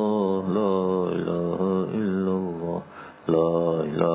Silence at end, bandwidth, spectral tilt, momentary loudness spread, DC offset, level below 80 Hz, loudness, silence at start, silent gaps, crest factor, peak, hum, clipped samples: 0 s; 4 kHz; -12 dB/octave; 8 LU; under 0.1%; -56 dBFS; -25 LUFS; 0 s; none; 18 dB; -6 dBFS; none; under 0.1%